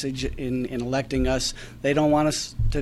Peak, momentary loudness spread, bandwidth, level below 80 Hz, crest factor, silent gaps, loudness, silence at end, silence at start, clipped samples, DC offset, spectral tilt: -8 dBFS; 8 LU; 14 kHz; -32 dBFS; 16 dB; none; -25 LUFS; 0 s; 0 s; under 0.1%; under 0.1%; -5 dB/octave